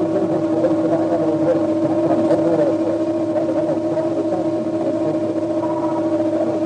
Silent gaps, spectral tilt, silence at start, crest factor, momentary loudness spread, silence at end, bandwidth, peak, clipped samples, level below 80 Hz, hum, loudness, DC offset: none; -8 dB/octave; 0 s; 12 dB; 4 LU; 0 s; 9.2 kHz; -6 dBFS; under 0.1%; -58 dBFS; none; -19 LUFS; under 0.1%